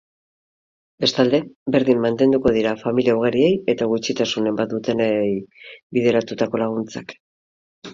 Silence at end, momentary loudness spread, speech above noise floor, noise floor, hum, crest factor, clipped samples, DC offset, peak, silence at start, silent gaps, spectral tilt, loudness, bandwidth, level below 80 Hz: 0 s; 8 LU; over 71 dB; under -90 dBFS; none; 18 dB; under 0.1%; under 0.1%; -2 dBFS; 1 s; 1.55-1.66 s, 5.83-5.90 s, 7.20-7.82 s; -5.5 dB/octave; -20 LUFS; 7.6 kHz; -56 dBFS